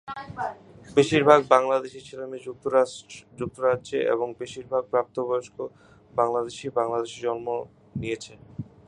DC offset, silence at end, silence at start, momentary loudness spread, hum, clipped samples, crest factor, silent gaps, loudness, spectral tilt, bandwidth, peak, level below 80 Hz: under 0.1%; 0.25 s; 0.05 s; 18 LU; none; under 0.1%; 24 dB; none; -25 LUFS; -5.5 dB/octave; 10.5 kHz; -2 dBFS; -60 dBFS